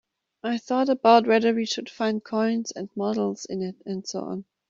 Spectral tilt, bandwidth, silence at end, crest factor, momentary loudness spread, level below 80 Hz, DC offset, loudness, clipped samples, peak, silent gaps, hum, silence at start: -5 dB/octave; 7.8 kHz; 0.25 s; 20 dB; 15 LU; -72 dBFS; under 0.1%; -24 LUFS; under 0.1%; -4 dBFS; none; none; 0.45 s